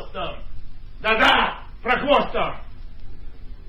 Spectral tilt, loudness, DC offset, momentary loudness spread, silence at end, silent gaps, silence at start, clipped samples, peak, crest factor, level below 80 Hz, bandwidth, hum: -4.5 dB/octave; -20 LUFS; under 0.1%; 17 LU; 0 s; none; 0 s; under 0.1%; -4 dBFS; 20 dB; -36 dBFS; 10 kHz; none